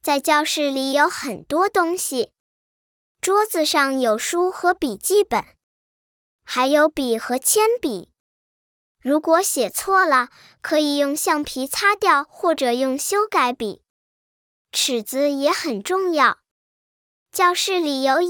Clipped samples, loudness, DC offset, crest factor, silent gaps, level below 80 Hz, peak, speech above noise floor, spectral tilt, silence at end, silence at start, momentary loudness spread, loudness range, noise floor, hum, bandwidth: under 0.1%; -20 LUFS; under 0.1%; 18 dB; 2.40-3.15 s, 5.63-6.39 s, 8.20-8.95 s, 13.90-14.65 s, 16.51-17.26 s; -60 dBFS; -2 dBFS; over 70 dB; -1.5 dB/octave; 0 s; 0.05 s; 9 LU; 3 LU; under -90 dBFS; none; over 20 kHz